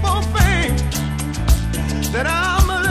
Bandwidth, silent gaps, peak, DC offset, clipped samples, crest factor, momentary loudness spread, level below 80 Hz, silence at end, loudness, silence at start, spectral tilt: 15.5 kHz; none; -2 dBFS; under 0.1%; under 0.1%; 16 dB; 6 LU; -20 dBFS; 0 s; -18 LUFS; 0 s; -4.5 dB/octave